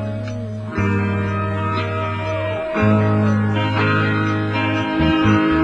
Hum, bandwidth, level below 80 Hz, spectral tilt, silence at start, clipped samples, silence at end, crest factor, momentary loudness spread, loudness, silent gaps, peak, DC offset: none; 7.6 kHz; -38 dBFS; -7.5 dB/octave; 0 s; under 0.1%; 0 s; 16 dB; 7 LU; -19 LUFS; none; -2 dBFS; under 0.1%